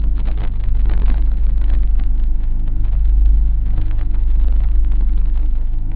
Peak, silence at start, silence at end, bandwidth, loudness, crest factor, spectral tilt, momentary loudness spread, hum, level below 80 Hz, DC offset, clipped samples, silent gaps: -2 dBFS; 0 s; 0 s; 2.6 kHz; -20 LUFS; 10 dB; -11 dB/octave; 6 LU; none; -12 dBFS; 3%; under 0.1%; none